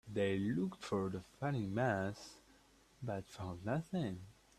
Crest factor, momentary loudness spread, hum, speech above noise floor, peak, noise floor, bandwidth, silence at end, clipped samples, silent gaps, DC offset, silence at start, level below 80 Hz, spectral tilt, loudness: 18 dB; 12 LU; none; 28 dB; -22 dBFS; -67 dBFS; 13.5 kHz; 0.25 s; under 0.1%; none; under 0.1%; 0.05 s; -68 dBFS; -7 dB/octave; -40 LUFS